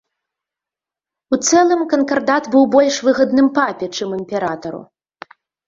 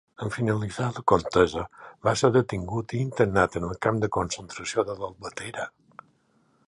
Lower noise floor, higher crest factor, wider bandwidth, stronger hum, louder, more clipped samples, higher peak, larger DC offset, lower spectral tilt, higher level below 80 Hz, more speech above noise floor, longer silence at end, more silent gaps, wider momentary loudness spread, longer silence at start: first, -88 dBFS vs -66 dBFS; second, 16 dB vs 22 dB; second, 7.8 kHz vs 11.5 kHz; neither; first, -16 LUFS vs -26 LUFS; neither; about the same, -2 dBFS vs -4 dBFS; neither; second, -3.5 dB/octave vs -5.5 dB/octave; second, -60 dBFS vs -50 dBFS; first, 73 dB vs 40 dB; second, 0.85 s vs 1 s; neither; about the same, 11 LU vs 13 LU; first, 1.3 s vs 0.2 s